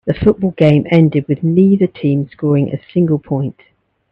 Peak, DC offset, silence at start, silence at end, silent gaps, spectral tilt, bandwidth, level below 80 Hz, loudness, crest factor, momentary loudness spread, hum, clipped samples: 0 dBFS; under 0.1%; 0.05 s; 0.6 s; none; -10.5 dB/octave; 5.4 kHz; -44 dBFS; -14 LUFS; 14 dB; 7 LU; none; under 0.1%